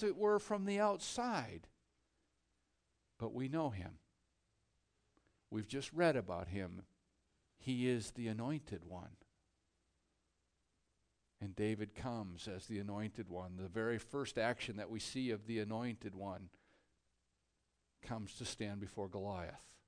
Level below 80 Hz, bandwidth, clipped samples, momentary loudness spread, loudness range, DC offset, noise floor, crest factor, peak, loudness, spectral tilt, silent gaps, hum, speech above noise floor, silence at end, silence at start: -70 dBFS; 10 kHz; under 0.1%; 14 LU; 7 LU; under 0.1%; -83 dBFS; 22 dB; -22 dBFS; -42 LUFS; -5.5 dB/octave; none; none; 42 dB; 0.1 s; 0 s